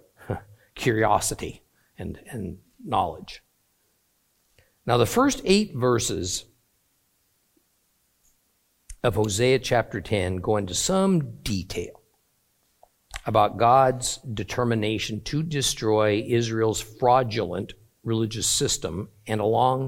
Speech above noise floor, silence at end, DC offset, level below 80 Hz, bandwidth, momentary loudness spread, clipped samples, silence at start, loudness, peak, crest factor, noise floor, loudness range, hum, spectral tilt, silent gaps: 45 dB; 0 s; under 0.1%; -48 dBFS; 16.5 kHz; 15 LU; under 0.1%; 0.2 s; -24 LUFS; -4 dBFS; 20 dB; -69 dBFS; 7 LU; none; -4.5 dB/octave; none